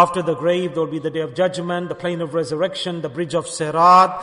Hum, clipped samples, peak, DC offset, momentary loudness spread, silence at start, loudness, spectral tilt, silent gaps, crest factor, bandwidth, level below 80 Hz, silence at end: none; under 0.1%; -2 dBFS; under 0.1%; 13 LU; 0 s; -19 LUFS; -5 dB/octave; none; 16 dB; 11 kHz; -60 dBFS; 0 s